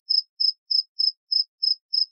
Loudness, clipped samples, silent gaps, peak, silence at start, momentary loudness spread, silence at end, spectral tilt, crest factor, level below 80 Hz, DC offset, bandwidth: -22 LUFS; under 0.1%; 0.29-0.37 s, 0.58-0.66 s, 0.88-0.95 s, 1.17-1.27 s, 1.48-1.58 s, 1.81-1.89 s; -10 dBFS; 0.1 s; 3 LU; 0.05 s; 10 dB/octave; 16 dB; under -90 dBFS; under 0.1%; 6.2 kHz